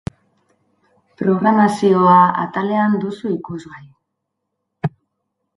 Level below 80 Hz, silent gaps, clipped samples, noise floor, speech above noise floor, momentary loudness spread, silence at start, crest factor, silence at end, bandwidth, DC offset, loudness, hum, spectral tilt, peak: -54 dBFS; none; under 0.1%; -76 dBFS; 61 dB; 15 LU; 1.2 s; 18 dB; 0.7 s; 11.5 kHz; under 0.1%; -16 LUFS; none; -7.5 dB/octave; 0 dBFS